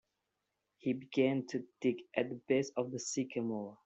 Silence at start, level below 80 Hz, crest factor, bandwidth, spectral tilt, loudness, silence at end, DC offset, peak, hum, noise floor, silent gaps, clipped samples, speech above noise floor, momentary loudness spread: 0.85 s; -80 dBFS; 18 dB; 8.2 kHz; -5 dB/octave; -36 LUFS; 0.1 s; under 0.1%; -18 dBFS; none; -86 dBFS; none; under 0.1%; 50 dB; 6 LU